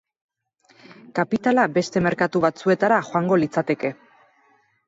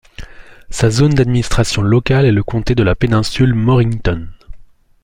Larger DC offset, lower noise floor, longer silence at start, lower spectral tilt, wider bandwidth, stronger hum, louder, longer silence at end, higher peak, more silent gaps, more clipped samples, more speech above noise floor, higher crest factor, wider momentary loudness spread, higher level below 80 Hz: neither; first, -61 dBFS vs -38 dBFS; first, 1.15 s vs 0.2 s; about the same, -6.5 dB/octave vs -6.5 dB/octave; second, 8 kHz vs 11.5 kHz; neither; second, -21 LUFS vs -14 LUFS; first, 0.95 s vs 0.4 s; about the same, -4 dBFS vs -2 dBFS; neither; neither; first, 41 dB vs 25 dB; first, 18 dB vs 12 dB; about the same, 7 LU vs 6 LU; second, -60 dBFS vs -28 dBFS